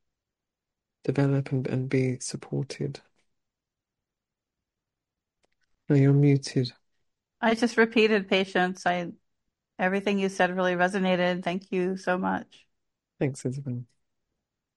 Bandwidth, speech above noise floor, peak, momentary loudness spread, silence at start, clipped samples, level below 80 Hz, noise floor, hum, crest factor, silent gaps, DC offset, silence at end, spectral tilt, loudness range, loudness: 11 kHz; 62 dB; -8 dBFS; 12 LU; 1.05 s; under 0.1%; -68 dBFS; -88 dBFS; none; 20 dB; none; under 0.1%; 0.95 s; -6 dB/octave; 9 LU; -26 LUFS